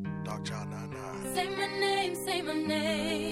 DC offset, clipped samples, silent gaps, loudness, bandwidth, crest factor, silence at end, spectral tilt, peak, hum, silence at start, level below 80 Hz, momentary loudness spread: under 0.1%; under 0.1%; none; -32 LUFS; 16 kHz; 16 dB; 0 s; -4 dB/octave; -16 dBFS; none; 0 s; -62 dBFS; 10 LU